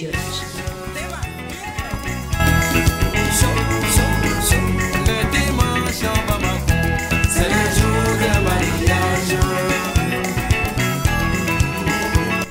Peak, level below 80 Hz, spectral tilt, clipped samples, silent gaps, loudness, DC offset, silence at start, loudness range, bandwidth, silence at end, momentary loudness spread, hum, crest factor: -6 dBFS; -26 dBFS; -4.5 dB/octave; under 0.1%; none; -18 LUFS; under 0.1%; 0 s; 2 LU; 16.5 kHz; 0 s; 10 LU; none; 12 dB